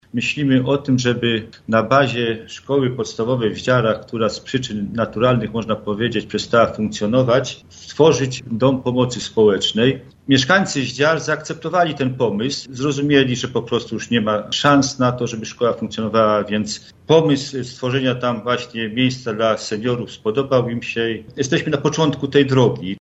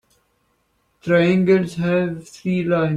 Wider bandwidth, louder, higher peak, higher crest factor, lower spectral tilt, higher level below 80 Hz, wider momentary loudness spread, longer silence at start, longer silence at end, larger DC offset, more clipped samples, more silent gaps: second, 8.2 kHz vs 11 kHz; about the same, -18 LUFS vs -19 LUFS; first, 0 dBFS vs -4 dBFS; about the same, 18 dB vs 16 dB; second, -5 dB/octave vs -7.5 dB/octave; about the same, -52 dBFS vs -56 dBFS; second, 8 LU vs 11 LU; second, 0.15 s vs 1.05 s; about the same, 0 s vs 0 s; neither; neither; neither